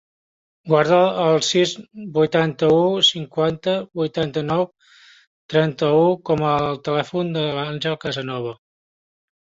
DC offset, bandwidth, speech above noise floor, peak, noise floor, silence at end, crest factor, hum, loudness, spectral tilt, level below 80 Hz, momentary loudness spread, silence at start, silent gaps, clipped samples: under 0.1%; 8 kHz; 31 dB; -4 dBFS; -50 dBFS; 1 s; 18 dB; none; -20 LUFS; -5 dB/octave; -58 dBFS; 10 LU; 0.65 s; 5.27-5.49 s; under 0.1%